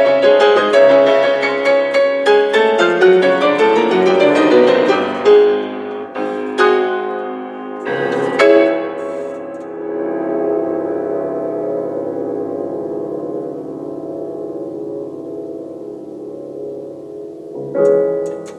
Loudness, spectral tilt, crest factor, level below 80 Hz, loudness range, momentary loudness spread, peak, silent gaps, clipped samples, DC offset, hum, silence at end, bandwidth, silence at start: -14 LUFS; -5 dB/octave; 14 dB; -66 dBFS; 14 LU; 17 LU; 0 dBFS; none; under 0.1%; under 0.1%; none; 0 s; 10 kHz; 0 s